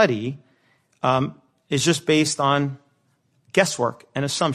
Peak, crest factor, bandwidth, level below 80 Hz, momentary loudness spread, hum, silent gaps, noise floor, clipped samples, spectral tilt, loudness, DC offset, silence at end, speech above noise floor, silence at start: -2 dBFS; 20 dB; 13 kHz; -62 dBFS; 11 LU; none; none; -66 dBFS; under 0.1%; -4.5 dB/octave; -22 LUFS; under 0.1%; 0 s; 44 dB; 0 s